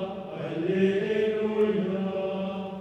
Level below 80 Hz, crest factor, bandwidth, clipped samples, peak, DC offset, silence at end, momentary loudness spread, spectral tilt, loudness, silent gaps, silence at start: -64 dBFS; 14 dB; 8.2 kHz; under 0.1%; -12 dBFS; under 0.1%; 0 s; 9 LU; -8 dB/octave; -27 LUFS; none; 0 s